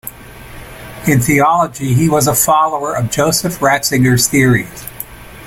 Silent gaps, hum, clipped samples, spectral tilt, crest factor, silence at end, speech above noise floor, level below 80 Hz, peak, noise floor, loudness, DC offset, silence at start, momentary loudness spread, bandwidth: none; none; under 0.1%; -4.5 dB/octave; 14 dB; 0 s; 21 dB; -38 dBFS; 0 dBFS; -33 dBFS; -13 LUFS; under 0.1%; 0.05 s; 18 LU; 17 kHz